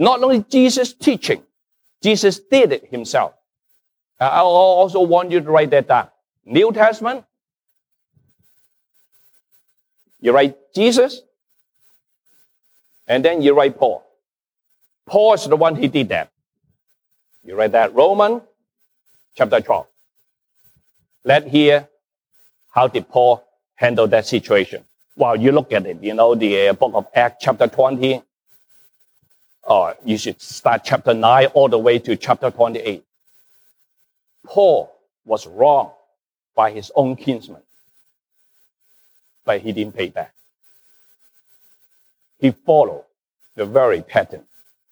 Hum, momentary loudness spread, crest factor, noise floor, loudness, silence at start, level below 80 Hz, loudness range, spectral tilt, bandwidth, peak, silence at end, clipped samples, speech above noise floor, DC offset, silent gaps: none; 12 LU; 16 dB; -79 dBFS; -16 LUFS; 0 s; -66 dBFS; 8 LU; -5 dB/octave; over 20 kHz; -2 dBFS; 0.55 s; under 0.1%; 64 dB; under 0.1%; none